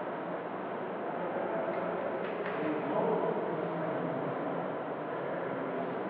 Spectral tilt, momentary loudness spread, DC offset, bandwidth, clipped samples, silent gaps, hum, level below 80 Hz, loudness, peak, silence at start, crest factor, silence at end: -5.5 dB/octave; 6 LU; under 0.1%; 4.9 kHz; under 0.1%; none; none; -82 dBFS; -35 LUFS; -18 dBFS; 0 s; 16 dB; 0 s